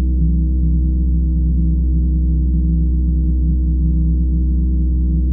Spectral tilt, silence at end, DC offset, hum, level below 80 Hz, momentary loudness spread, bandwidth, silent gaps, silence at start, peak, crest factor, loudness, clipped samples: -20 dB/octave; 0 s; under 0.1%; none; -16 dBFS; 1 LU; 0.7 kHz; none; 0 s; -6 dBFS; 8 dB; -17 LUFS; under 0.1%